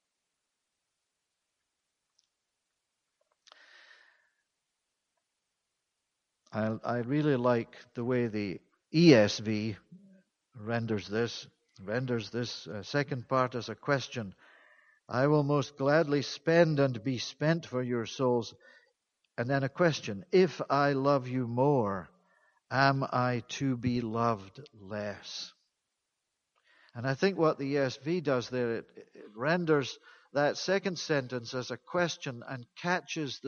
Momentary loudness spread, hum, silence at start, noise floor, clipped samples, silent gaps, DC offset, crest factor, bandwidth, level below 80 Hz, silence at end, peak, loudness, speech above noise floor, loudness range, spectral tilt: 13 LU; none; 6.5 s; -85 dBFS; under 0.1%; none; under 0.1%; 24 dB; 7.2 kHz; -70 dBFS; 0 s; -8 dBFS; -30 LUFS; 55 dB; 7 LU; -6 dB/octave